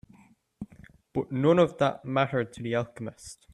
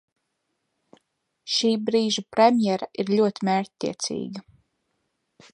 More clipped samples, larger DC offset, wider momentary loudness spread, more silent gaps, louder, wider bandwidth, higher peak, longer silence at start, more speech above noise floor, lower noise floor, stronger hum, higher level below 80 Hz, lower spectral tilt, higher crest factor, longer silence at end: neither; neither; first, 23 LU vs 13 LU; neither; second, -27 LUFS vs -23 LUFS; about the same, 12 kHz vs 11 kHz; second, -10 dBFS vs -4 dBFS; second, 0.6 s vs 1.45 s; second, 32 dB vs 54 dB; second, -59 dBFS vs -77 dBFS; neither; first, -62 dBFS vs -70 dBFS; first, -6.5 dB/octave vs -4.5 dB/octave; about the same, 20 dB vs 22 dB; second, 0.2 s vs 1.15 s